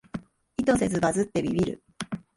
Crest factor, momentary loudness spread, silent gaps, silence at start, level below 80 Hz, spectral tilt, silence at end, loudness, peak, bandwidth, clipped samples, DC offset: 18 dB; 14 LU; none; 0.15 s; -52 dBFS; -5.5 dB/octave; 0.2 s; -27 LUFS; -10 dBFS; 11.5 kHz; under 0.1%; under 0.1%